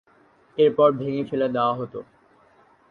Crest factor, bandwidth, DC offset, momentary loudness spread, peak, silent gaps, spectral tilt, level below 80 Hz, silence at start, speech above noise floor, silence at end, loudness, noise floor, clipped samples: 18 dB; 4.8 kHz; under 0.1%; 17 LU; -6 dBFS; none; -9 dB/octave; -66 dBFS; 0.55 s; 36 dB; 0.9 s; -22 LUFS; -58 dBFS; under 0.1%